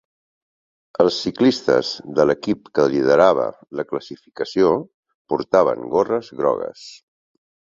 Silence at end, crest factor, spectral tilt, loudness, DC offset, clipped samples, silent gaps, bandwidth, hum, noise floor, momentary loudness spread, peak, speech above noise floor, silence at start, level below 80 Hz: 0.75 s; 18 dB; -5.5 dB/octave; -19 LUFS; under 0.1%; under 0.1%; 4.94-5.03 s, 5.14-5.25 s; 7.6 kHz; none; under -90 dBFS; 13 LU; -2 dBFS; over 71 dB; 1 s; -58 dBFS